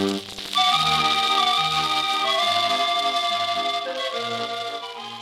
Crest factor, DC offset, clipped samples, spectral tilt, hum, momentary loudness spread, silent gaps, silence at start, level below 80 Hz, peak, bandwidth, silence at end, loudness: 16 dB; under 0.1%; under 0.1%; -2 dB/octave; none; 10 LU; none; 0 s; -60 dBFS; -6 dBFS; 16.5 kHz; 0 s; -21 LUFS